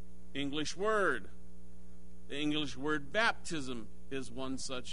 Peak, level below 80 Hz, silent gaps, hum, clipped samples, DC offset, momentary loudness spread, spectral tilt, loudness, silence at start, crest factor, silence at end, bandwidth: -16 dBFS; -58 dBFS; none; none; under 0.1%; 2%; 13 LU; -3.5 dB/octave; -36 LUFS; 0 s; 22 dB; 0 s; 10.5 kHz